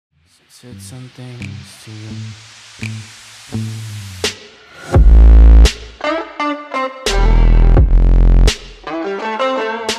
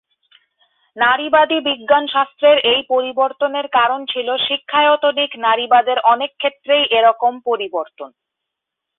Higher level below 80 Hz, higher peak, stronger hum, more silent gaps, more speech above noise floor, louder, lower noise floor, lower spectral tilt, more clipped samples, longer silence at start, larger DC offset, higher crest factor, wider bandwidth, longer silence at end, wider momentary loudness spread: first, -14 dBFS vs -64 dBFS; about the same, 0 dBFS vs -2 dBFS; neither; neither; second, 11 dB vs 65 dB; about the same, -14 LUFS vs -16 LUFS; second, -38 dBFS vs -81 dBFS; second, -5.5 dB/octave vs -7 dB/octave; neither; second, 0.7 s vs 0.95 s; neither; about the same, 12 dB vs 16 dB; first, 11 kHz vs 4.1 kHz; second, 0 s vs 0.9 s; first, 24 LU vs 8 LU